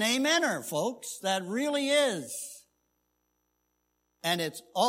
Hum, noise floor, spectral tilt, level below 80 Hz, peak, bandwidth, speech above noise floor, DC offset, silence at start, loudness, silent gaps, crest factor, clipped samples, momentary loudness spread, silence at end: 60 Hz at -65 dBFS; -78 dBFS; -2.5 dB/octave; -82 dBFS; -12 dBFS; 16 kHz; 49 dB; under 0.1%; 0 s; -29 LUFS; none; 20 dB; under 0.1%; 10 LU; 0 s